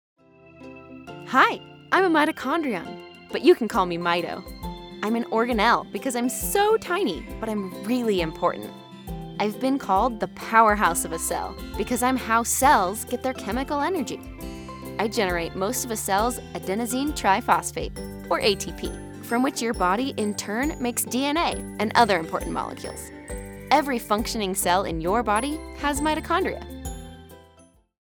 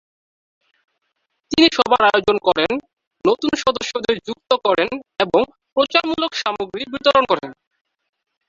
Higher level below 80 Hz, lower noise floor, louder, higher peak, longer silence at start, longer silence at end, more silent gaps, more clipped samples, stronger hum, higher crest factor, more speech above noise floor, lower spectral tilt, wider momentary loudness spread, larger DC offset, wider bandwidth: first, -44 dBFS vs -54 dBFS; second, -56 dBFS vs -72 dBFS; second, -24 LUFS vs -18 LUFS; about the same, -4 dBFS vs -2 dBFS; second, 0.55 s vs 1.5 s; second, 0.65 s vs 0.95 s; second, none vs 2.93-2.97 s, 3.07-3.11 s, 5.72-5.76 s; neither; neither; about the same, 22 dB vs 18 dB; second, 32 dB vs 55 dB; about the same, -3.5 dB/octave vs -3.5 dB/octave; first, 17 LU vs 9 LU; neither; first, over 20 kHz vs 7.8 kHz